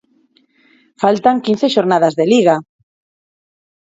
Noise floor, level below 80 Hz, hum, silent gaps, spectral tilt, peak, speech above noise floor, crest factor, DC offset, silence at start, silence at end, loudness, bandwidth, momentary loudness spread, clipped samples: -56 dBFS; -64 dBFS; none; none; -5.5 dB/octave; 0 dBFS; 44 dB; 16 dB; under 0.1%; 1 s; 1.35 s; -14 LUFS; 8 kHz; 4 LU; under 0.1%